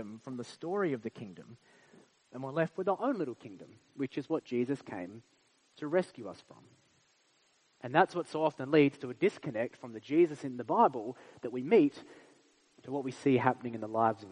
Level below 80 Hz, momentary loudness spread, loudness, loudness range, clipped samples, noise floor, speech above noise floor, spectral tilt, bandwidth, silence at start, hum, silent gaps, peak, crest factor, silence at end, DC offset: -80 dBFS; 20 LU; -32 LUFS; 7 LU; under 0.1%; -71 dBFS; 38 dB; -7 dB/octave; 10 kHz; 0 s; none; none; -8 dBFS; 24 dB; 0 s; under 0.1%